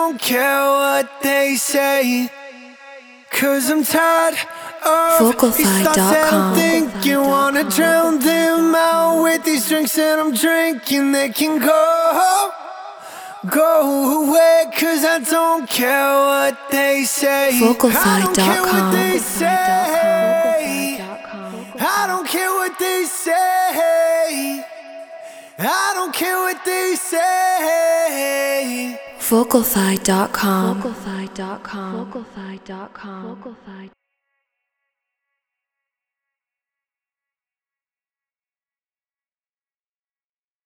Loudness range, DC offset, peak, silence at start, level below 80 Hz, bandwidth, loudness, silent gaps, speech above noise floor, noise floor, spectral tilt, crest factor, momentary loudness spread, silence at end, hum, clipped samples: 5 LU; under 0.1%; 0 dBFS; 0 s; -56 dBFS; over 20 kHz; -16 LUFS; none; over 74 dB; under -90 dBFS; -3.5 dB/octave; 18 dB; 16 LU; 6.75 s; none; under 0.1%